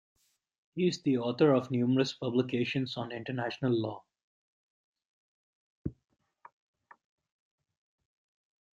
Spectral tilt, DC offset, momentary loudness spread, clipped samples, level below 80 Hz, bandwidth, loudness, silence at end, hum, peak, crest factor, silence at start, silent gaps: -6.5 dB/octave; under 0.1%; 17 LU; under 0.1%; -68 dBFS; 7.6 kHz; -31 LUFS; 2.85 s; none; -12 dBFS; 22 dB; 0.75 s; 4.23-4.93 s, 5.05-5.84 s